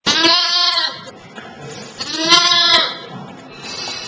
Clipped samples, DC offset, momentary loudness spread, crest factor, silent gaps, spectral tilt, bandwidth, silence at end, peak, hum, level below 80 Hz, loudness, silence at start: under 0.1%; under 0.1%; 24 LU; 18 dB; none; -1 dB/octave; 8 kHz; 0 s; 0 dBFS; none; -56 dBFS; -12 LUFS; 0.05 s